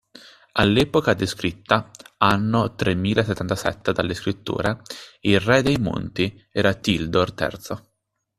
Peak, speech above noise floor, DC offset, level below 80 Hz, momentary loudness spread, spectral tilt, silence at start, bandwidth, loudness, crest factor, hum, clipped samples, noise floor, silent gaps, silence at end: 0 dBFS; 54 dB; under 0.1%; -46 dBFS; 9 LU; -5.5 dB/octave; 0.55 s; 14 kHz; -22 LUFS; 22 dB; none; under 0.1%; -76 dBFS; none; 0.6 s